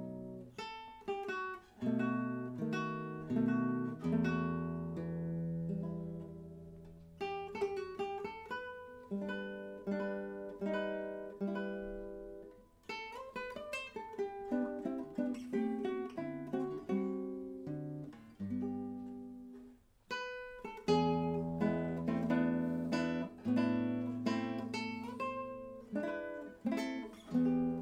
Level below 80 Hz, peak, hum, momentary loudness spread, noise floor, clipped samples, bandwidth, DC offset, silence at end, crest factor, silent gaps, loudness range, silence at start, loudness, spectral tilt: -66 dBFS; -18 dBFS; none; 13 LU; -60 dBFS; under 0.1%; 10.5 kHz; under 0.1%; 0 s; 20 dB; none; 7 LU; 0 s; -39 LUFS; -7 dB/octave